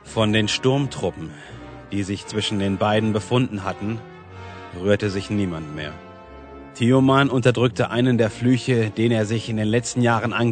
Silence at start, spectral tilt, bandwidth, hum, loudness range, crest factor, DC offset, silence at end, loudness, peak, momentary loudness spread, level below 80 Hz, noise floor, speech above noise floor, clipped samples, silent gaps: 0.05 s; -6 dB/octave; 9.4 kHz; none; 6 LU; 18 dB; under 0.1%; 0 s; -21 LUFS; -2 dBFS; 20 LU; -52 dBFS; -40 dBFS; 20 dB; under 0.1%; none